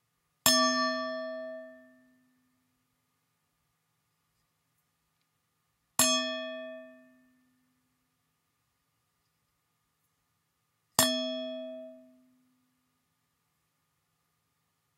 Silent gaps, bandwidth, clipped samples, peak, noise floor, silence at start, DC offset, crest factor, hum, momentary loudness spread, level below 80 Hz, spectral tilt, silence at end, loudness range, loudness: none; 16 kHz; under 0.1%; -2 dBFS; -78 dBFS; 0.45 s; under 0.1%; 34 dB; none; 21 LU; -74 dBFS; -1 dB/octave; 2.95 s; 16 LU; -28 LUFS